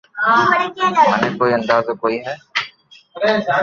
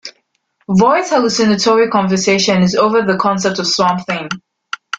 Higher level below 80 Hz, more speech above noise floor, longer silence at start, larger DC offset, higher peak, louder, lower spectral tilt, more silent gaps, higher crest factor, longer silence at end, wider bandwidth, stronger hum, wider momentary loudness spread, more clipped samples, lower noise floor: second, -58 dBFS vs -52 dBFS; second, 30 dB vs 50 dB; about the same, 0.15 s vs 0.05 s; neither; about the same, -2 dBFS vs -2 dBFS; second, -17 LUFS vs -13 LUFS; about the same, -5 dB/octave vs -4.5 dB/octave; neither; about the same, 16 dB vs 14 dB; second, 0 s vs 0.6 s; second, 7.4 kHz vs 8.8 kHz; neither; second, 9 LU vs 13 LU; neither; second, -46 dBFS vs -63 dBFS